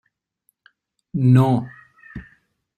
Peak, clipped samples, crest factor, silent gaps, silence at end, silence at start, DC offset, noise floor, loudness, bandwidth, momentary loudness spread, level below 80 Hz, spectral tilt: -4 dBFS; under 0.1%; 18 dB; none; 0.55 s; 1.15 s; under 0.1%; -69 dBFS; -18 LUFS; 9 kHz; 24 LU; -52 dBFS; -9.5 dB/octave